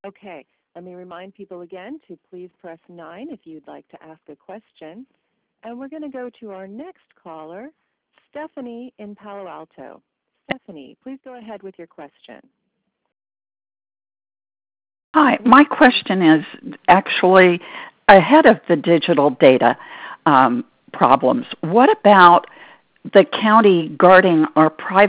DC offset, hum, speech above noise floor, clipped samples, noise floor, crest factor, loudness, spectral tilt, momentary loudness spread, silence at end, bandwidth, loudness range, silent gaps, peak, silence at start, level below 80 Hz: under 0.1%; none; 57 dB; under 0.1%; -74 dBFS; 18 dB; -14 LUFS; -9.5 dB/octave; 25 LU; 0 s; 4 kHz; 24 LU; 15.04-15.14 s; 0 dBFS; 0.05 s; -58 dBFS